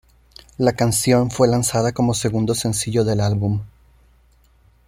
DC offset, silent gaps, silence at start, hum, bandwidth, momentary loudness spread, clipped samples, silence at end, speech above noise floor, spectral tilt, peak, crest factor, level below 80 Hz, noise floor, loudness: under 0.1%; none; 0.6 s; none; 16 kHz; 5 LU; under 0.1%; 1.2 s; 36 dB; -5.5 dB/octave; -2 dBFS; 18 dB; -46 dBFS; -55 dBFS; -19 LUFS